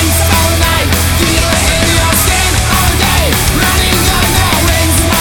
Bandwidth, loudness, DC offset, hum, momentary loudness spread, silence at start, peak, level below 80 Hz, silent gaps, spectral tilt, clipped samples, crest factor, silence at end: over 20 kHz; -9 LUFS; 2%; none; 1 LU; 0 s; 0 dBFS; -16 dBFS; none; -3.5 dB/octave; under 0.1%; 10 dB; 0 s